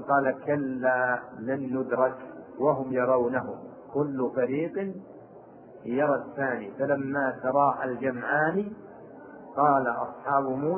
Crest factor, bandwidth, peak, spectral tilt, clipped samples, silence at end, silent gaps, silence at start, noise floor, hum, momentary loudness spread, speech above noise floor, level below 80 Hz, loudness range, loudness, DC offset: 18 dB; 3.4 kHz; -10 dBFS; -11.5 dB/octave; under 0.1%; 0 s; none; 0 s; -49 dBFS; none; 17 LU; 22 dB; -70 dBFS; 3 LU; -27 LUFS; under 0.1%